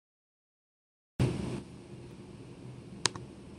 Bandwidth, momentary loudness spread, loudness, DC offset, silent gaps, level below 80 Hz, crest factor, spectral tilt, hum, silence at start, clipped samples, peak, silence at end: 12 kHz; 16 LU; -35 LUFS; under 0.1%; none; -54 dBFS; 34 dB; -4 dB/octave; none; 1.2 s; under 0.1%; -4 dBFS; 0 s